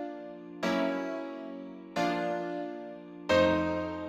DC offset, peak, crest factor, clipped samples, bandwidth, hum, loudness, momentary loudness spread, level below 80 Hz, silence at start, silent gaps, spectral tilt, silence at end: under 0.1%; -14 dBFS; 18 dB; under 0.1%; 15 kHz; none; -31 LUFS; 17 LU; -60 dBFS; 0 s; none; -5.5 dB/octave; 0 s